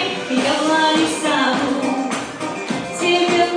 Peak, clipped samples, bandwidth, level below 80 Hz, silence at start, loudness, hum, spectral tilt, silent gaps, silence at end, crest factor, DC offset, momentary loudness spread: -4 dBFS; under 0.1%; 10 kHz; -58 dBFS; 0 s; -18 LUFS; none; -3 dB/octave; none; 0 s; 14 dB; under 0.1%; 9 LU